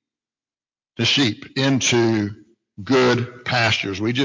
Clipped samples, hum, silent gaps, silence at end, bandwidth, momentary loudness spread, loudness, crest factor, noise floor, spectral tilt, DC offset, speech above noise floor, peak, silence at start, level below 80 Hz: under 0.1%; none; none; 0 s; 7.6 kHz; 6 LU; -19 LUFS; 16 dB; under -90 dBFS; -4 dB/octave; under 0.1%; over 71 dB; -6 dBFS; 1 s; -52 dBFS